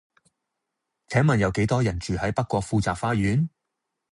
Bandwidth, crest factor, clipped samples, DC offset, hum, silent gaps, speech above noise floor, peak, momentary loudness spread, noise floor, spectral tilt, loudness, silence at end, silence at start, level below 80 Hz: 11 kHz; 18 dB; under 0.1%; under 0.1%; none; none; 59 dB; -8 dBFS; 5 LU; -82 dBFS; -6.5 dB/octave; -24 LUFS; 0.65 s; 1.1 s; -44 dBFS